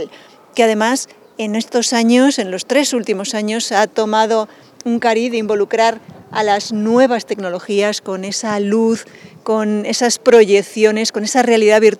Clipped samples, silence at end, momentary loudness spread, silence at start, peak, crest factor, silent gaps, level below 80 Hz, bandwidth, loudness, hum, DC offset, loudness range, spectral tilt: under 0.1%; 0 s; 11 LU; 0 s; 0 dBFS; 14 dB; none; -68 dBFS; 14 kHz; -15 LUFS; none; under 0.1%; 3 LU; -3.5 dB/octave